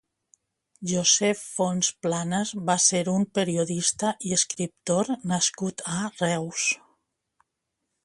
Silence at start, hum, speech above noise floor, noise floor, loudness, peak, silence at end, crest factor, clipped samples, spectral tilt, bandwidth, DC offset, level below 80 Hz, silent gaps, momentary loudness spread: 0.8 s; none; 56 dB; -81 dBFS; -25 LUFS; -6 dBFS; 1.3 s; 20 dB; under 0.1%; -3 dB/octave; 11.5 kHz; under 0.1%; -66 dBFS; none; 9 LU